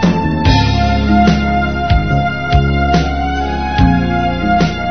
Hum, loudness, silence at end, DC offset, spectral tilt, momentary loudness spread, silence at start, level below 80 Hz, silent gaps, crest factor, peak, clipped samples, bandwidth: none; -13 LUFS; 0 s; 3%; -7 dB/octave; 5 LU; 0 s; -20 dBFS; none; 12 dB; 0 dBFS; under 0.1%; 6.6 kHz